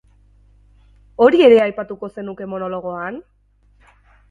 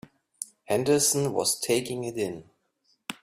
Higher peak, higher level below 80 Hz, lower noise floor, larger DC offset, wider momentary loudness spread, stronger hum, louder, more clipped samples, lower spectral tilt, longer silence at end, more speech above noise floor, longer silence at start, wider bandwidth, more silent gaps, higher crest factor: first, 0 dBFS vs -10 dBFS; first, -54 dBFS vs -66 dBFS; second, -55 dBFS vs -71 dBFS; neither; about the same, 19 LU vs 18 LU; first, 50 Hz at -50 dBFS vs none; first, -16 LUFS vs -26 LUFS; neither; first, -7 dB/octave vs -3.5 dB/octave; first, 1.1 s vs 0.1 s; second, 39 dB vs 45 dB; first, 1.2 s vs 0.4 s; second, 7.2 kHz vs 16 kHz; neither; about the same, 18 dB vs 18 dB